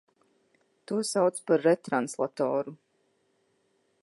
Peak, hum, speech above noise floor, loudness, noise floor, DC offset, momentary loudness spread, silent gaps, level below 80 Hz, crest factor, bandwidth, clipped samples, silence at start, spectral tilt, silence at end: -12 dBFS; none; 45 dB; -28 LUFS; -72 dBFS; under 0.1%; 8 LU; none; -84 dBFS; 18 dB; 11.5 kHz; under 0.1%; 0.9 s; -5 dB/octave; 1.3 s